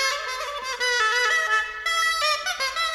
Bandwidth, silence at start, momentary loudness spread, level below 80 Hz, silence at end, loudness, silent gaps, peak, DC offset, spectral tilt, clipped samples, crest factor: 17.5 kHz; 0 s; 8 LU; -56 dBFS; 0 s; -22 LUFS; none; -8 dBFS; under 0.1%; 2.5 dB/octave; under 0.1%; 16 dB